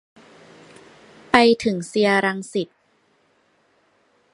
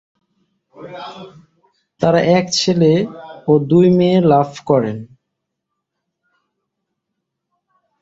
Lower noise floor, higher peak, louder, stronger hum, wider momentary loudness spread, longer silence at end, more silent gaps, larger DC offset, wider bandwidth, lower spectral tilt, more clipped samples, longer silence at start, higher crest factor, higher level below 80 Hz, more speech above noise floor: second, -63 dBFS vs -77 dBFS; about the same, 0 dBFS vs 0 dBFS; second, -19 LUFS vs -14 LUFS; neither; second, 13 LU vs 20 LU; second, 1.7 s vs 2.95 s; neither; neither; first, 11.5 kHz vs 7.8 kHz; second, -4.5 dB/octave vs -6 dB/octave; neither; first, 1.35 s vs 0.8 s; first, 24 dB vs 18 dB; about the same, -58 dBFS vs -56 dBFS; second, 44 dB vs 63 dB